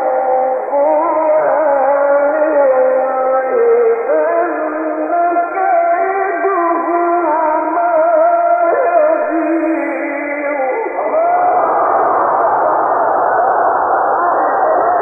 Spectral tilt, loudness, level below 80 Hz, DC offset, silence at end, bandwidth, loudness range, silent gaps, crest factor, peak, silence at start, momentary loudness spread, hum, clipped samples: -10 dB/octave; -13 LUFS; -62 dBFS; under 0.1%; 0 s; 2.6 kHz; 2 LU; none; 12 dB; -2 dBFS; 0 s; 5 LU; none; under 0.1%